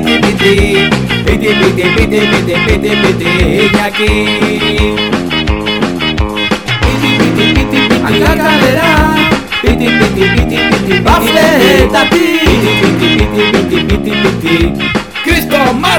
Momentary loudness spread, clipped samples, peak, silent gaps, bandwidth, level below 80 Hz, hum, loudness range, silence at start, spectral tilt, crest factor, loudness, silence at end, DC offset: 5 LU; 2%; 0 dBFS; none; over 20 kHz; -20 dBFS; none; 3 LU; 0 s; -5 dB/octave; 10 dB; -9 LUFS; 0 s; 1%